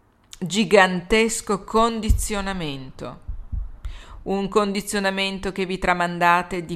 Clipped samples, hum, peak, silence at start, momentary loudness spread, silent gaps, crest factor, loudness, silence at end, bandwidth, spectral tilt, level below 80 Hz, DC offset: under 0.1%; none; 0 dBFS; 0.35 s; 18 LU; none; 22 dB; -21 LUFS; 0 s; 15.5 kHz; -4 dB/octave; -34 dBFS; under 0.1%